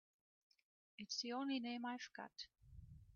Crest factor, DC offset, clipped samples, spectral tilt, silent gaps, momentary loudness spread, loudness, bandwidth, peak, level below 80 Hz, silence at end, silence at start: 18 dB; under 0.1%; under 0.1%; -2 dB/octave; none; 19 LU; -47 LUFS; 7.2 kHz; -32 dBFS; -74 dBFS; 0 s; 1 s